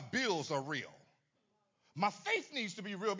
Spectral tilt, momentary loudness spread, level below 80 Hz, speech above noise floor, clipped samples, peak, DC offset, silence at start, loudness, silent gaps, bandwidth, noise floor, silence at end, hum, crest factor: -4 dB/octave; 7 LU; -82 dBFS; 42 dB; under 0.1%; -20 dBFS; under 0.1%; 0 s; -37 LUFS; none; 7.6 kHz; -80 dBFS; 0 s; none; 20 dB